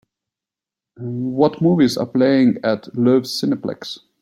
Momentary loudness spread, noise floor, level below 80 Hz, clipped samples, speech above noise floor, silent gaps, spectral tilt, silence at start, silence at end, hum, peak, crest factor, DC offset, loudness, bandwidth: 14 LU; -88 dBFS; -60 dBFS; under 0.1%; 71 dB; none; -6.5 dB/octave; 1 s; 0.25 s; none; -2 dBFS; 16 dB; under 0.1%; -18 LUFS; 14.5 kHz